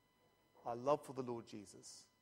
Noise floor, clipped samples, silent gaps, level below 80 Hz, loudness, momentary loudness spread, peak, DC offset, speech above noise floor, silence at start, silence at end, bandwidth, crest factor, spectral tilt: -76 dBFS; under 0.1%; none; -82 dBFS; -44 LUFS; 16 LU; -22 dBFS; under 0.1%; 32 dB; 0.55 s; 0.15 s; 16 kHz; 24 dB; -5.5 dB/octave